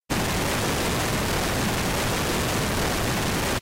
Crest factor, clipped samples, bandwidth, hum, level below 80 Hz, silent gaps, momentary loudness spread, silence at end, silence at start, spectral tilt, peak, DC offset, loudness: 10 dB; under 0.1%; 16 kHz; none; -36 dBFS; none; 0 LU; 0 s; 0.1 s; -3.5 dB/octave; -14 dBFS; under 0.1%; -24 LUFS